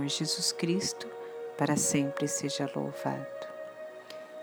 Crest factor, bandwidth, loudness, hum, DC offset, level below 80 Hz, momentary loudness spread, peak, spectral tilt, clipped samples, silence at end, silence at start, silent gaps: 18 dB; over 20 kHz; -31 LUFS; none; under 0.1%; -76 dBFS; 16 LU; -14 dBFS; -3.5 dB/octave; under 0.1%; 0 s; 0 s; none